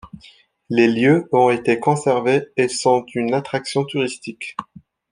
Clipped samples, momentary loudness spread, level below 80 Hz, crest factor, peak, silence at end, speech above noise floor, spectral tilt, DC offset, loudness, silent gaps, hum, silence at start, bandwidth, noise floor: under 0.1%; 14 LU; -60 dBFS; 18 dB; -2 dBFS; 0.5 s; 32 dB; -5.5 dB/octave; under 0.1%; -18 LUFS; none; none; 0.05 s; 10.5 kHz; -50 dBFS